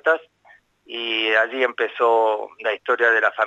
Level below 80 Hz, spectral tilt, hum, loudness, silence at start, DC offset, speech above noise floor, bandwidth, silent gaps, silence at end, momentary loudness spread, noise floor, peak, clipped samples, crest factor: -80 dBFS; -2 dB/octave; 50 Hz at -75 dBFS; -20 LUFS; 0.05 s; under 0.1%; 34 dB; 7.8 kHz; none; 0 s; 8 LU; -54 dBFS; -6 dBFS; under 0.1%; 16 dB